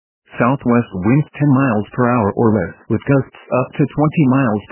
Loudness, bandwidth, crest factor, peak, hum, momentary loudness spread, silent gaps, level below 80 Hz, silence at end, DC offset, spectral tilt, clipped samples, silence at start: -16 LUFS; 3.2 kHz; 16 dB; 0 dBFS; none; 6 LU; none; -44 dBFS; 0.1 s; under 0.1%; -12.5 dB/octave; under 0.1%; 0.35 s